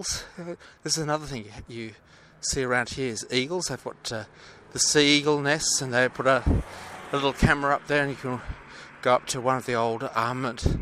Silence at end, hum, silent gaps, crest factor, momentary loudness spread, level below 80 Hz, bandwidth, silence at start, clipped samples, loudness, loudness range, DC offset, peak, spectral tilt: 0 s; none; none; 20 dB; 17 LU; -40 dBFS; 15 kHz; 0 s; under 0.1%; -25 LUFS; 7 LU; under 0.1%; -6 dBFS; -3.5 dB/octave